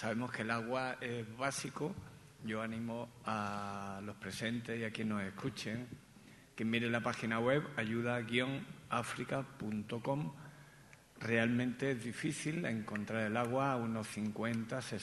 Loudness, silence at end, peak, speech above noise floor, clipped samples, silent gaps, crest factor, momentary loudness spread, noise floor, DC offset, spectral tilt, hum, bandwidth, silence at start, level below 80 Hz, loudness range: -38 LUFS; 0 s; -18 dBFS; 22 dB; under 0.1%; none; 22 dB; 11 LU; -61 dBFS; under 0.1%; -5.5 dB/octave; none; 12 kHz; 0 s; -72 dBFS; 5 LU